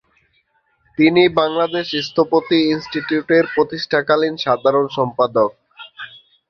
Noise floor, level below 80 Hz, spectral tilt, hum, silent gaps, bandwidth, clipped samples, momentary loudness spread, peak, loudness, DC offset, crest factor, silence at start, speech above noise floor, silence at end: -63 dBFS; -58 dBFS; -6 dB/octave; none; none; 6.6 kHz; under 0.1%; 8 LU; -2 dBFS; -17 LUFS; under 0.1%; 16 dB; 1 s; 46 dB; 0.35 s